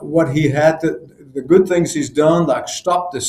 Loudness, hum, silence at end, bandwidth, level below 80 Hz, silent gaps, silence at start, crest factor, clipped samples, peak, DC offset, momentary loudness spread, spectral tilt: -16 LUFS; none; 0 s; 14 kHz; -50 dBFS; none; 0 s; 14 dB; under 0.1%; 0 dBFS; under 0.1%; 10 LU; -5.5 dB/octave